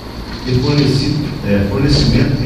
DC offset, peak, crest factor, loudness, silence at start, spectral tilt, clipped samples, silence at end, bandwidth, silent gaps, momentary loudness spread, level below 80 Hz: under 0.1%; 0 dBFS; 14 dB; -14 LUFS; 0 s; -6.5 dB/octave; under 0.1%; 0 s; 14 kHz; none; 7 LU; -26 dBFS